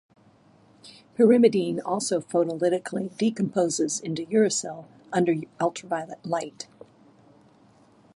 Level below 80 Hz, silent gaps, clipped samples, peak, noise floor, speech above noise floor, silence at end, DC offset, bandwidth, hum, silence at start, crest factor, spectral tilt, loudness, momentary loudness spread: -74 dBFS; none; under 0.1%; -6 dBFS; -57 dBFS; 33 dB; 1.55 s; under 0.1%; 11.5 kHz; none; 0.85 s; 20 dB; -5 dB/octave; -25 LUFS; 14 LU